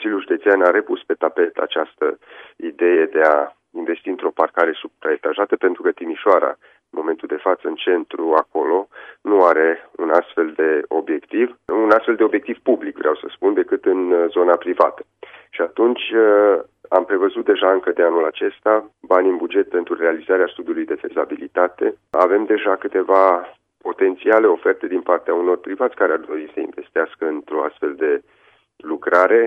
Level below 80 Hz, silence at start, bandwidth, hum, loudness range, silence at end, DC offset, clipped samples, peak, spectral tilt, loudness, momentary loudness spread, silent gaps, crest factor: -70 dBFS; 0 s; 5 kHz; none; 3 LU; 0 s; under 0.1%; under 0.1%; 0 dBFS; -6 dB/octave; -18 LUFS; 10 LU; none; 18 dB